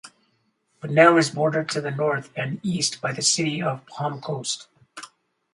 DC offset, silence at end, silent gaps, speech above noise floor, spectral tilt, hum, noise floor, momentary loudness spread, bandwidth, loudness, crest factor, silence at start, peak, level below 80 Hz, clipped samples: under 0.1%; 0.5 s; none; 46 dB; -4 dB/octave; none; -69 dBFS; 20 LU; 11.5 kHz; -22 LUFS; 22 dB; 0.05 s; -2 dBFS; -68 dBFS; under 0.1%